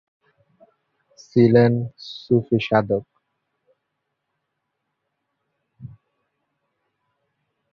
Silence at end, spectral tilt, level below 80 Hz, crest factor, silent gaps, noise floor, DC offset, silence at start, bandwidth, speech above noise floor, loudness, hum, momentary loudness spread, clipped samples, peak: 1.85 s; -8.5 dB/octave; -60 dBFS; 22 dB; none; -78 dBFS; under 0.1%; 1.35 s; 6.6 kHz; 59 dB; -19 LUFS; 50 Hz at -65 dBFS; 12 LU; under 0.1%; -2 dBFS